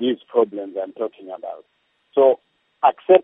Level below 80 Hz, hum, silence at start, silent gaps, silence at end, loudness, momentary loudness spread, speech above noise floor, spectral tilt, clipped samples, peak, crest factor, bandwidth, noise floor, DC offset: -80 dBFS; none; 0 s; none; 0 s; -21 LUFS; 17 LU; 21 dB; -9 dB/octave; under 0.1%; -2 dBFS; 18 dB; 3.9 kHz; -41 dBFS; under 0.1%